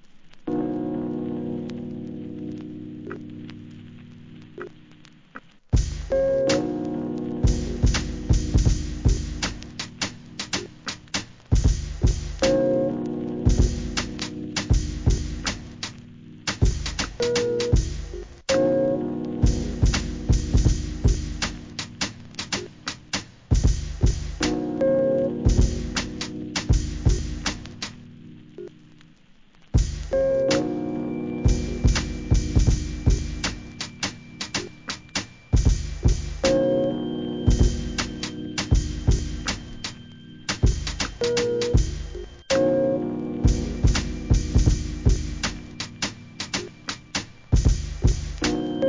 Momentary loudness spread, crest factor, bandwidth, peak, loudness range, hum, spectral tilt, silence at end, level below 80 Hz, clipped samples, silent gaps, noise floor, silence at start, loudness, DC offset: 13 LU; 20 dB; 7.6 kHz; -4 dBFS; 5 LU; none; -5.5 dB/octave; 0 s; -28 dBFS; under 0.1%; none; -53 dBFS; 0.05 s; -25 LUFS; 0.1%